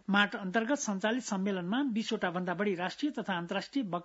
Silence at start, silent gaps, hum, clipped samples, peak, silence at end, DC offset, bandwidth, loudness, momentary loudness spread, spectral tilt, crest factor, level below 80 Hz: 0.1 s; none; none; under 0.1%; -12 dBFS; 0 s; under 0.1%; 7.6 kHz; -33 LUFS; 5 LU; -3.5 dB/octave; 20 dB; -76 dBFS